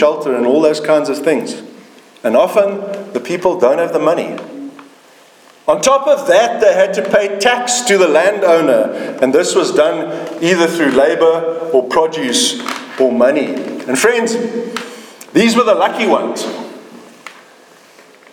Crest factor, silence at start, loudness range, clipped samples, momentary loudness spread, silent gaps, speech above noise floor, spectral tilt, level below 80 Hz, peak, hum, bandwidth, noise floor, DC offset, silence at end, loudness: 14 dB; 0 s; 4 LU; under 0.1%; 12 LU; none; 32 dB; -3.5 dB/octave; -60 dBFS; 0 dBFS; none; 18 kHz; -44 dBFS; under 0.1%; 1 s; -13 LUFS